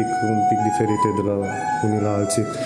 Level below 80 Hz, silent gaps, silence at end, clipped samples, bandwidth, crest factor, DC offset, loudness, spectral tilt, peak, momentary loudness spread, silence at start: -58 dBFS; none; 0 s; under 0.1%; 15.5 kHz; 14 dB; under 0.1%; -21 LUFS; -6 dB/octave; -6 dBFS; 4 LU; 0 s